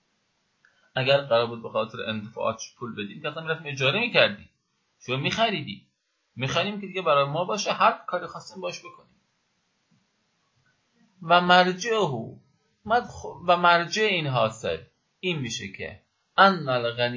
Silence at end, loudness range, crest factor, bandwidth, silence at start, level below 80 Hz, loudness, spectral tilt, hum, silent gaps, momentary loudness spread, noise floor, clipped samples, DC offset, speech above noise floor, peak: 0 s; 5 LU; 24 dB; 7.8 kHz; 0.95 s; -62 dBFS; -24 LUFS; -4.5 dB/octave; none; none; 17 LU; -72 dBFS; under 0.1%; under 0.1%; 47 dB; -2 dBFS